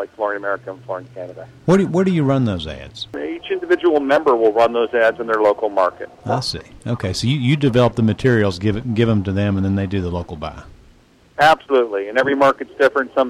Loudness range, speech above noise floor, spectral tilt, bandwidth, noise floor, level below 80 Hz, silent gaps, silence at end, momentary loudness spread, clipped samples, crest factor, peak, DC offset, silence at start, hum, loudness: 3 LU; 33 dB; -6.5 dB/octave; 13.5 kHz; -50 dBFS; -46 dBFS; none; 0 s; 14 LU; under 0.1%; 14 dB; -4 dBFS; under 0.1%; 0 s; none; -18 LUFS